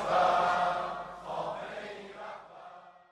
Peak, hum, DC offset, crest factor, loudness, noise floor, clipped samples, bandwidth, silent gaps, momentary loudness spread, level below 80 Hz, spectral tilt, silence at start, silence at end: -14 dBFS; none; under 0.1%; 18 dB; -31 LUFS; -52 dBFS; under 0.1%; 11 kHz; none; 22 LU; -64 dBFS; -4 dB/octave; 0 s; 0.2 s